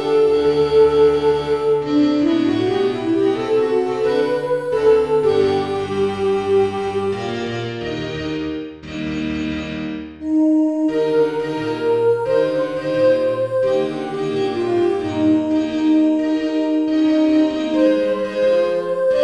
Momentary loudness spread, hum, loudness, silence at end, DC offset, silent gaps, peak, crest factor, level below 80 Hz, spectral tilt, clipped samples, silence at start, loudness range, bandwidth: 9 LU; none; -18 LUFS; 0 s; 0.2%; none; -4 dBFS; 14 dB; -48 dBFS; -7 dB/octave; under 0.1%; 0 s; 5 LU; 11 kHz